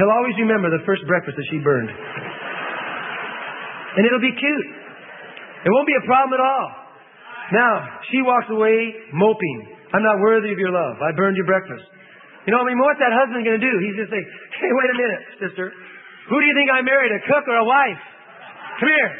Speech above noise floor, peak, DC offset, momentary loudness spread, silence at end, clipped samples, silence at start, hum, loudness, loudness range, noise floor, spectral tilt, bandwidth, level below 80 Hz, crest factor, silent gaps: 26 dB; -2 dBFS; under 0.1%; 16 LU; 0 s; under 0.1%; 0 s; none; -19 LUFS; 4 LU; -45 dBFS; -10.5 dB/octave; 3.9 kHz; -68 dBFS; 18 dB; none